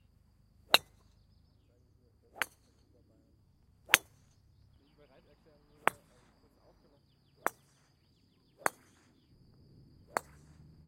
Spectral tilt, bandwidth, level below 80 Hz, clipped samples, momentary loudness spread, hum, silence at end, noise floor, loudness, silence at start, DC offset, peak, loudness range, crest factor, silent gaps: -0.5 dB/octave; 16 kHz; -70 dBFS; under 0.1%; 12 LU; none; 2.2 s; -69 dBFS; -33 LUFS; 0.75 s; under 0.1%; 0 dBFS; 8 LU; 40 dB; none